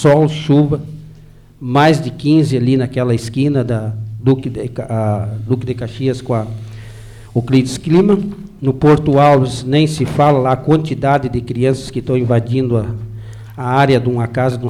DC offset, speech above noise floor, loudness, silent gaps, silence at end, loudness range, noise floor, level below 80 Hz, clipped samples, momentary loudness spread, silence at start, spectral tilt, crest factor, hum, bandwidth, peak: under 0.1%; 26 dB; -15 LUFS; none; 0 s; 6 LU; -40 dBFS; -40 dBFS; under 0.1%; 13 LU; 0 s; -7.5 dB/octave; 12 dB; none; 12.5 kHz; -2 dBFS